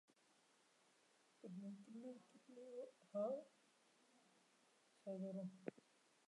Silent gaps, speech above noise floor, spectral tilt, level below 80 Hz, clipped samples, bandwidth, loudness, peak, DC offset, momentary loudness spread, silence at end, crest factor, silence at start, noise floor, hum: none; 26 dB; -7.5 dB/octave; under -90 dBFS; under 0.1%; 11 kHz; -53 LUFS; -32 dBFS; under 0.1%; 16 LU; 0.5 s; 24 dB; 1.45 s; -78 dBFS; none